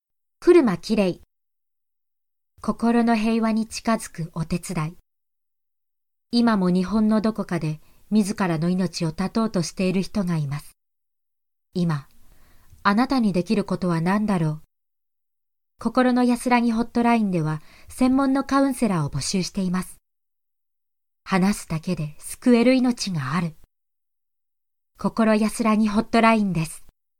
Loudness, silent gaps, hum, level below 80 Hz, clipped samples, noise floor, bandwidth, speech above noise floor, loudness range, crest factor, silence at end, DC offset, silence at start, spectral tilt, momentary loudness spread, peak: -22 LUFS; none; none; -48 dBFS; under 0.1%; -86 dBFS; 15.5 kHz; 64 dB; 5 LU; 18 dB; 0.35 s; under 0.1%; 0.4 s; -6 dB/octave; 12 LU; -4 dBFS